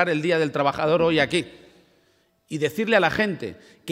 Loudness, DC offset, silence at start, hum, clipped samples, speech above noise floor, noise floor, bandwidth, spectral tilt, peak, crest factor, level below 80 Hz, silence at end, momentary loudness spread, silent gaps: -22 LUFS; under 0.1%; 0 s; none; under 0.1%; 42 dB; -64 dBFS; 16 kHz; -5.5 dB/octave; -4 dBFS; 20 dB; -58 dBFS; 0 s; 16 LU; none